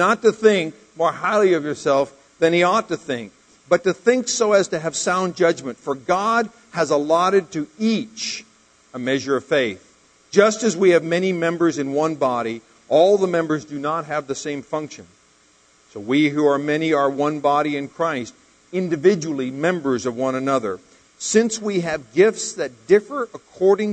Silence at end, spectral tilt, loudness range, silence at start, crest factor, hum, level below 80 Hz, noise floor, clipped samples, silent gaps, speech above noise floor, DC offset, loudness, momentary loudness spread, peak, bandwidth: 0 s; -4.5 dB/octave; 3 LU; 0 s; 20 dB; none; -64 dBFS; -56 dBFS; under 0.1%; none; 37 dB; under 0.1%; -20 LUFS; 12 LU; 0 dBFS; 9.4 kHz